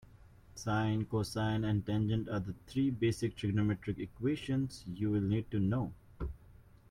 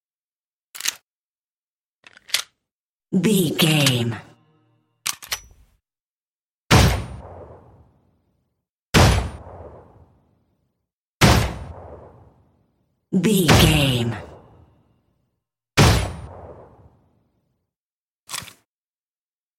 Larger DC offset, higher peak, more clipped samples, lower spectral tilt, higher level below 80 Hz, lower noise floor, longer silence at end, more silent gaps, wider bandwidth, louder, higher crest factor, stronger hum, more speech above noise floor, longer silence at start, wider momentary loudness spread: neither; second, -20 dBFS vs 0 dBFS; neither; first, -7 dB/octave vs -4.5 dB/octave; second, -54 dBFS vs -34 dBFS; second, -59 dBFS vs under -90 dBFS; second, 0.4 s vs 1.15 s; second, none vs 1.03-2.03 s, 2.71-2.99 s, 6.00-6.70 s, 8.69-8.93 s, 10.93-11.20 s, 17.80-18.27 s; second, 13 kHz vs 16.5 kHz; second, -35 LUFS vs -19 LUFS; second, 16 dB vs 24 dB; neither; second, 25 dB vs over 73 dB; second, 0.55 s vs 0.75 s; second, 10 LU vs 23 LU